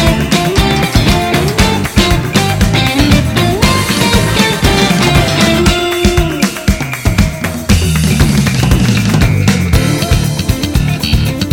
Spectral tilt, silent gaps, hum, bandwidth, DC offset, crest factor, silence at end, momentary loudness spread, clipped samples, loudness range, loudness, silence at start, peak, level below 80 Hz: -5 dB/octave; none; none; 18 kHz; under 0.1%; 10 dB; 0 s; 4 LU; 0.7%; 2 LU; -11 LUFS; 0 s; 0 dBFS; -18 dBFS